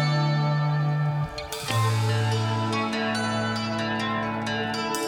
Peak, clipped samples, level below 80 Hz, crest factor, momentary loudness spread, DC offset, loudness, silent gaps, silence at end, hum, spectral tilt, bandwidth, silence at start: -10 dBFS; under 0.1%; -54 dBFS; 16 dB; 4 LU; under 0.1%; -26 LUFS; none; 0 s; none; -5.5 dB/octave; 18 kHz; 0 s